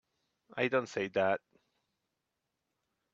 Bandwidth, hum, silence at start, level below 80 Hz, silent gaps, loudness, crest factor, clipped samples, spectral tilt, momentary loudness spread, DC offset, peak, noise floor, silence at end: 8 kHz; none; 0.55 s; -78 dBFS; none; -33 LUFS; 22 dB; under 0.1%; -5.5 dB/octave; 6 LU; under 0.1%; -16 dBFS; -86 dBFS; 1.75 s